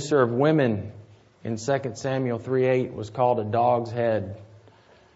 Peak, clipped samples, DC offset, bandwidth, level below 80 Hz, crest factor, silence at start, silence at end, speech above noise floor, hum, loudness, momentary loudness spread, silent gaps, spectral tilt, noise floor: -6 dBFS; under 0.1%; under 0.1%; 8 kHz; -64 dBFS; 18 dB; 0 s; 0.6 s; 31 dB; none; -24 LUFS; 13 LU; none; -7 dB/octave; -54 dBFS